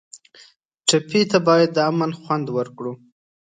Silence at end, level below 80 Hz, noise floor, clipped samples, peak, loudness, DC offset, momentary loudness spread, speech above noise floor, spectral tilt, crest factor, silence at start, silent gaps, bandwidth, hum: 0.45 s; -66 dBFS; -52 dBFS; under 0.1%; -2 dBFS; -19 LUFS; under 0.1%; 15 LU; 33 dB; -4.5 dB/octave; 20 dB; 0.15 s; 0.65-0.69 s; 9.6 kHz; none